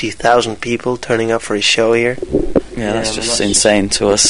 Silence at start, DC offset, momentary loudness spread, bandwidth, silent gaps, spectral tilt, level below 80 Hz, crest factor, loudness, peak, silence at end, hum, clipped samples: 0 s; 1%; 8 LU; 11 kHz; none; -3 dB/octave; -34 dBFS; 14 dB; -14 LUFS; 0 dBFS; 0 s; none; under 0.1%